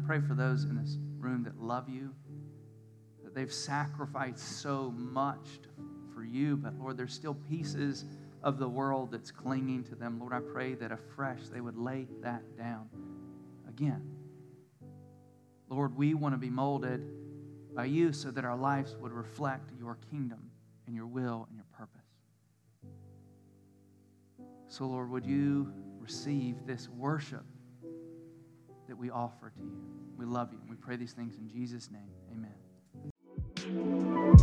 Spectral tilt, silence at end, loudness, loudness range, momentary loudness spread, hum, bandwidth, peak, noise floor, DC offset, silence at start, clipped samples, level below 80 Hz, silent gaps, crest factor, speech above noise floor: -7 dB/octave; 0 s; -36 LUFS; 9 LU; 20 LU; none; 10.5 kHz; -6 dBFS; -69 dBFS; under 0.1%; 0 s; under 0.1%; -44 dBFS; 33.11-33.16 s; 30 dB; 36 dB